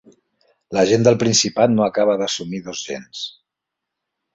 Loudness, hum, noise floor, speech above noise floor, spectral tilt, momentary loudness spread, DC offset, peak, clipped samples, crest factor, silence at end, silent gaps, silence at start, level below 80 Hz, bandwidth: -18 LUFS; none; -82 dBFS; 64 dB; -4 dB/octave; 15 LU; under 0.1%; -2 dBFS; under 0.1%; 18 dB; 1.05 s; none; 0.7 s; -58 dBFS; 8.2 kHz